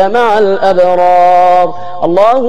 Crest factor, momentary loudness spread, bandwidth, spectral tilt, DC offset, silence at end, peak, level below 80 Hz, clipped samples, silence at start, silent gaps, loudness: 8 dB; 7 LU; 9.4 kHz; -6 dB/octave; 10%; 0 s; 0 dBFS; -48 dBFS; under 0.1%; 0 s; none; -8 LUFS